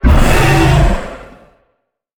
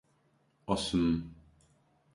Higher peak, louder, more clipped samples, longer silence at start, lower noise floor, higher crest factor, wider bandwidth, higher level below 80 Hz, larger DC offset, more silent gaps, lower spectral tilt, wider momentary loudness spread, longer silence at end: first, 0 dBFS vs -14 dBFS; first, -11 LUFS vs -32 LUFS; neither; second, 0.05 s vs 0.7 s; second, -66 dBFS vs -71 dBFS; second, 12 dB vs 22 dB; first, 19.5 kHz vs 11.5 kHz; first, -16 dBFS vs -52 dBFS; neither; neither; about the same, -6 dB/octave vs -5.5 dB/octave; about the same, 19 LU vs 20 LU; first, 0.95 s vs 0.8 s